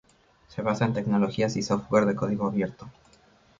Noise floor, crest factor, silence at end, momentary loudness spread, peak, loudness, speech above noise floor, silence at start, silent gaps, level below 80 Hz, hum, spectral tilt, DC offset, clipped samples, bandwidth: -59 dBFS; 18 dB; 0.7 s; 9 LU; -8 dBFS; -26 LUFS; 33 dB; 0.5 s; none; -56 dBFS; none; -6.5 dB/octave; under 0.1%; under 0.1%; 7.6 kHz